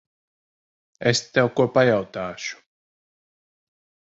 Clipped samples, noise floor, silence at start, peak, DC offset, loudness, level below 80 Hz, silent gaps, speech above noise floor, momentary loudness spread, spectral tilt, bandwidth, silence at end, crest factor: under 0.1%; under -90 dBFS; 1 s; -4 dBFS; under 0.1%; -21 LUFS; -60 dBFS; none; over 69 dB; 13 LU; -4.5 dB/octave; 8 kHz; 1.6 s; 22 dB